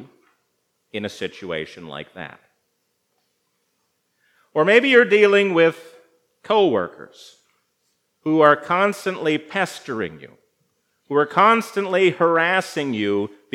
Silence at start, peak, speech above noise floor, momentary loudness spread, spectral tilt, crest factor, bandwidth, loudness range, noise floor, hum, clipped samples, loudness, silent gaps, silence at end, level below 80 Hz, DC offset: 0 s; 0 dBFS; 52 dB; 18 LU; -5 dB/octave; 20 dB; 14.5 kHz; 16 LU; -71 dBFS; none; under 0.1%; -19 LUFS; none; 0.3 s; -74 dBFS; under 0.1%